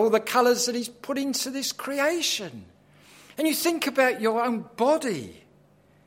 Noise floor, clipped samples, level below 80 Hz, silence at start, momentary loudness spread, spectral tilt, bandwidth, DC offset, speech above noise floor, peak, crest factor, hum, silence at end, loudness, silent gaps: -58 dBFS; under 0.1%; -72 dBFS; 0 s; 10 LU; -2.5 dB/octave; 16.5 kHz; under 0.1%; 33 dB; -6 dBFS; 20 dB; none; 0.7 s; -25 LUFS; none